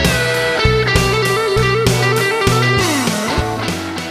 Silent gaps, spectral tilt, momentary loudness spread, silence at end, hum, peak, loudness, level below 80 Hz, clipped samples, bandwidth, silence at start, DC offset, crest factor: none; -4.5 dB/octave; 5 LU; 0 s; none; 0 dBFS; -15 LUFS; -28 dBFS; under 0.1%; 15 kHz; 0 s; under 0.1%; 14 dB